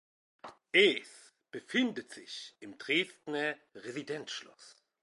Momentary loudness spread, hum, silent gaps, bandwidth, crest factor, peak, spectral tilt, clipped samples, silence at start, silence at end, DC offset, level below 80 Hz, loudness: 26 LU; none; none; 11.5 kHz; 24 dB; -12 dBFS; -3.5 dB/octave; under 0.1%; 0.45 s; 0.35 s; under 0.1%; -88 dBFS; -32 LUFS